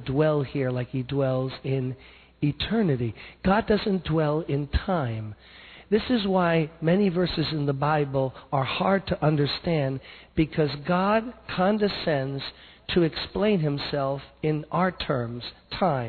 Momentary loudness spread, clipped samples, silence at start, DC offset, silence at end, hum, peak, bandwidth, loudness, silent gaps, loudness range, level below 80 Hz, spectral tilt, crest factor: 10 LU; under 0.1%; 0 s; under 0.1%; 0 s; none; -10 dBFS; 4.6 kHz; -26 LUFS; none; 2 LU; -46 dBFS; -10 dB/octave; 16 dB